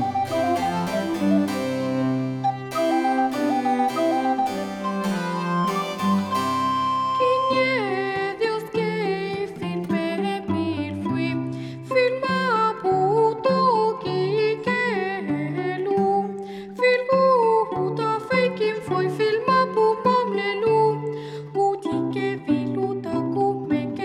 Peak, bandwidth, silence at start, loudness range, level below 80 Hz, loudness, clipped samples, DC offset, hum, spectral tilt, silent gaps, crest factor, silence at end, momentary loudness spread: -6 dBFS; 18.5 kHz; 0 s; 3 LU; -62 dBFS; -23 LUFS; under 0.1%; under 0.1%; none; -6.5 dB/octave; none; 16 dB; 0 s; 7 LU